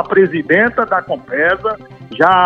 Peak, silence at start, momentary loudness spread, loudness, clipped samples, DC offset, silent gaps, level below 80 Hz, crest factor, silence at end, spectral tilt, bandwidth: 0 dBFS; 0 s; 10 LU; -14 LUFS; under 0.1%; 0.1%; none; -50 dBFS; 14 dB; 0 s; -7.5 dB/octave; 6 kHz